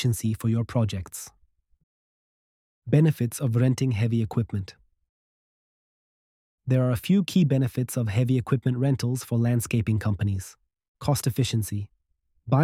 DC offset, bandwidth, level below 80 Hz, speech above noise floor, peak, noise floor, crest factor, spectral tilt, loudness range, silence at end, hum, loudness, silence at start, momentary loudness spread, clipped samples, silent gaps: under 0.1%; 16 kHz; -54 dBFS; 47 dB; -8 dBFS; -71 dBFS; 18 dB; -6.5 dB/octave; 4 LU; 0 s; none; -25 LUFS; 0 s; 12 LU; under 0.1%; 1.83-2.82 s, 5.09-6.58 s, 10.88-10.95 s